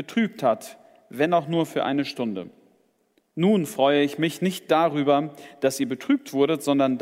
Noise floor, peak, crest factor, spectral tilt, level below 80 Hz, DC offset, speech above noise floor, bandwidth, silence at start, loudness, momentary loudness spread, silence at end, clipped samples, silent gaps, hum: -67 dBFS; -6 dBFS; 18 dB; -5.5 dB/octave; -76 dBFS; under 0.1%; 44 dB; 16 kHz; 0 s; -23 LUFS; 10 LU; 0 s; under 0.1%; none; none